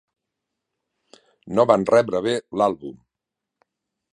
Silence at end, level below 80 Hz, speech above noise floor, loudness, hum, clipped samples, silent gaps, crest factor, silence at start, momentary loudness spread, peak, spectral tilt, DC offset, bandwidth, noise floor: 1.2 s; -62 dBFS; 65 dB; -20 LUFS; none; under 0.1%; none; 22 dB; 1.45 s; 13 LU; -2 dBFS; -6 dB/octave; under 0.1%; 10.5 kHz; -85 dBFS